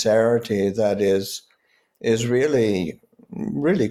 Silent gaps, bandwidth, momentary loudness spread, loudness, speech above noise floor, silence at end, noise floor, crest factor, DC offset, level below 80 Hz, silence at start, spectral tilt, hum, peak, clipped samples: none; 15.5 kHz; 13 LU; -22 LUFS; 44 dB; 0 s; -64 dBFS; 14 dB; under 0.1%; -58 dBFS; 0 s; -5.5 dB/octave; none; -8 dBFS; under 0.1%